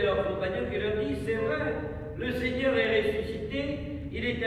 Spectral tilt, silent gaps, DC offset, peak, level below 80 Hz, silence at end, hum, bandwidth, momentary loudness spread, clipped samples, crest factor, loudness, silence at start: -7 dB/octave; none; under 0.1%; -14 dBFS; -44 dBFS; 0 s; none; 13.5 kHz; 9 LU; under 0.1%; 16 dB; -30 LUFS; 0 s